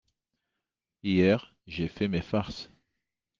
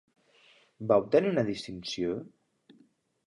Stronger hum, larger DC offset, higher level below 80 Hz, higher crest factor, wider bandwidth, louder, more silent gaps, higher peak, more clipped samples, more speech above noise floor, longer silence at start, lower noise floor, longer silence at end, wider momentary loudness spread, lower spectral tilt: neither; neither; first, -58 dBFS vs -66 dBFS; about the same, 20 dB vs 22 dB; second, 7.2 kHz vs 11 kHz; about the same, -29 LUFS vs -29 LUFS; neither; about the same, -10 dBFS vs -10 dBFS; neither; first, 59 dB vs 37 dB; first, 1.05 s vs 0.8 s; first, -87 dBFS vs -66 dBFS; second, 0.75 s vs 1 s; first, 17 LU vs 14 LU; first, -7.5 dB/octave vs -6 dB/octave